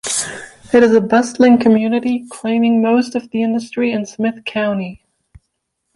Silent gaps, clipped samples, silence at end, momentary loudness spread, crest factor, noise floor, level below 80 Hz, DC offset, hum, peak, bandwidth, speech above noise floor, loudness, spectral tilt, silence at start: none; under 0.1%; 1 s; 10 LU; 14 dB; -72 dBFS; -54 dBFS; under 0.1%; none; 0 dBFS; 11.5 kHz; 58 dB; -15 LUFS; -4.5 dB/octave; 0.05 s